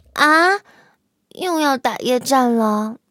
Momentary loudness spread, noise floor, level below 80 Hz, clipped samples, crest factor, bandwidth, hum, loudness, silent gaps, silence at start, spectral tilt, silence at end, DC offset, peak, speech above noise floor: 10 LU; -59 dBFS; -64 dBFS; under 0.1%; 18 dB; 17 kHz; none; -17 LUFS; none; 0.15 s; -3.5 dB/octave; 0.15 s; under 0.1%; 0 dBFS; 42 dB